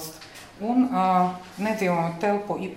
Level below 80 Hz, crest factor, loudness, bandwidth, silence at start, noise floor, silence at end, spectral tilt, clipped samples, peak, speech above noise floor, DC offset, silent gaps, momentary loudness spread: -62 dBFS; 16 dB; -24 LUFS; 16 kHz; 0 s; -44 dBFS; 0 s; -6.5 dB/octave; under 0.1%; -8 dBFS; 20 dB; under 0.1%; none; 15 LU